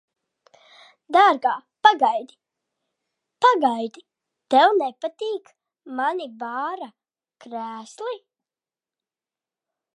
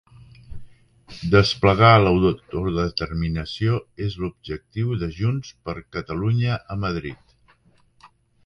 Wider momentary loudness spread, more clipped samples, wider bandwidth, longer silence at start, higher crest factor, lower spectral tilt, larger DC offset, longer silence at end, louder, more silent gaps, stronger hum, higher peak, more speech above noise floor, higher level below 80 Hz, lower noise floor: about the same, 17 LU vs 16 LU; neither; first, 11 kHz vs 9.8 kHz; first, 1.1 s vs 0.5 s; about the same, 22 dB vs 22 dB; second, -3 dB/octave vs -7 dB/octave; neither; first, 1.8 s vs 1.3 s; about the same, -21 LUFS vs -22 LUFS; neither; neither; about the same, -2 dBFS vs 0 dBFS; first, over 68 dB vs 37 dB; second, -86 dBFS vs -40 dBFS; first, under -90 dBFS vs -58 dBFS